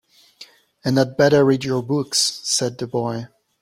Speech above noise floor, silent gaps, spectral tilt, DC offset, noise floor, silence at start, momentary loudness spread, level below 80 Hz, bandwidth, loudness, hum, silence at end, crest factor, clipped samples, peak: 28 dB; none; -4 dB/octave; under 0.1%; -47 dBFS; 0.4 s; 12 LU; -56 dBFS; 16.5 kHz; -19 LUFS; none; 0.35 s; 18 dB; under 0.1%; -2 dBFS